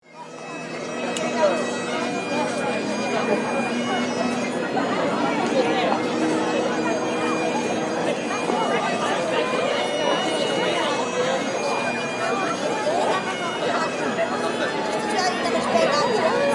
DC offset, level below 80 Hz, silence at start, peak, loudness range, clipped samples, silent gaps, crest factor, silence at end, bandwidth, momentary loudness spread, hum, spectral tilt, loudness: under 0.1%; -66 dBFS; 0.1 s; -6 dBFS; 1 LU; under 0.1%; none; 16 dB; 0 s; 11.5 kHz; 4 LU; none; -4 dB/octave; -23 LUFS